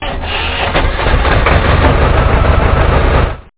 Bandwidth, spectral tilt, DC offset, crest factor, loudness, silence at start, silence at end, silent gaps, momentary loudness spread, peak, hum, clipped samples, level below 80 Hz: 4 kHz; -10 dB/octave; 0.7%; 10 dB; -12 LUFS; 0 s; 0.15 s; none; 4 LU; 0 dBFS; none; under 0.1%; -14 dBFS